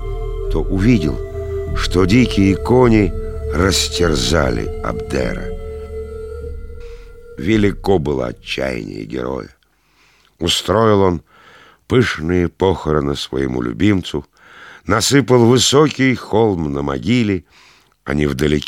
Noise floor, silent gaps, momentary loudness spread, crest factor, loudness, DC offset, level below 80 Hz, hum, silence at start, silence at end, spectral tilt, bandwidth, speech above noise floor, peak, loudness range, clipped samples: -57 dBFS; none; 16 LU; 16 dB; -16 LUFS; under 0.1%; -28 dBFS; none; 0 s; 0 s; -5 dB/octave; 16.5 kHz; 42 dB; 0 dBFS; 6 LU; under 0.1%